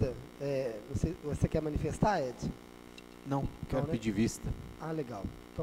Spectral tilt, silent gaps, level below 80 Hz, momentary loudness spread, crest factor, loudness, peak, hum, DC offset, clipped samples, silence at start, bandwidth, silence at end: -6.5 dB/octave; none; -46 dBFS; 12 LU; 22 dB; -35 LUFS; -14 dBFS; 60 Hz at -55 dBFS; under 0.1%; under 0.1%; 0 s; 16 kHz; 0 s